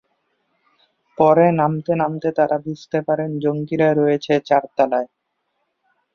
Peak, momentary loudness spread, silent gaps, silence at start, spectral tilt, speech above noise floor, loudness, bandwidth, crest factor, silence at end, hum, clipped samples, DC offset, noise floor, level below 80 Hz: -2 dBFS; 9 LU; none; 1.2 s; -8 dB/octave; 54 dB; -19 LUFS; 6.8 kHz; 18 dB; 1.1 s; none; under 0.1%; under 0.1%; -72 dBFS; -62 dBFS